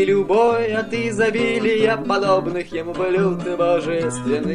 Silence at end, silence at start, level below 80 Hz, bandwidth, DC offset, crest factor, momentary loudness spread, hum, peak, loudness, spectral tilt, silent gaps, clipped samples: 0 s; 0 s; -52 dBFS; 11 kHz; 0.6%; 16 dB; 6 LU; none; -4 dBFS; -19 LUFS; -5.5 dB/octave; none; under 0.1%